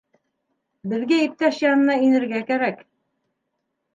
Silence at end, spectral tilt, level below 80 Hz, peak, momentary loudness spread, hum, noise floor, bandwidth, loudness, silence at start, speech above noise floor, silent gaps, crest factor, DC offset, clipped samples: 1.2 s; -5.5 dB/octave; -78 dBFS; -6 dBFS; 11 LU; none; -77 dBFS; 7.6 kHz; -20 LUFS; 0.85 s; 57 dB; none; 16 dB; under 0.1%; under 0.1%